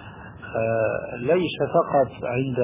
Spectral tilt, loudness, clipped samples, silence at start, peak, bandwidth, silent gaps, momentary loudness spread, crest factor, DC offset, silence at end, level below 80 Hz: -10.5 dB/octave; -24 LUFS; under 0.1%; 0 s; -6 dBFS; 3.8 kHz; none; 10 LU; 16 dB; under 0.1%; 0 s; -52 dBFS